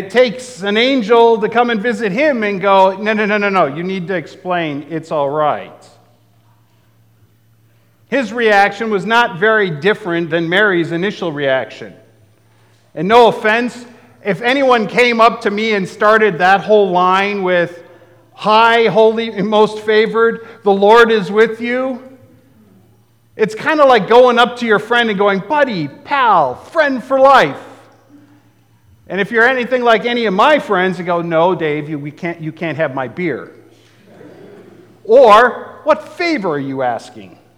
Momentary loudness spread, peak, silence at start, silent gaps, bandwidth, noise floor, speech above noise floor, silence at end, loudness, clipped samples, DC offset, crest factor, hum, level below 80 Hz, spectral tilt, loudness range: 12 LU; 0 dBFS; 0 s; none; 12.5 kHz; -52 dBFS; 39 dB; 0.3 s; -13 LUFS; under 0.1%; 0.1%; 14 dB; none; -60 dBFS; -5.5 dB/octave; 7 LU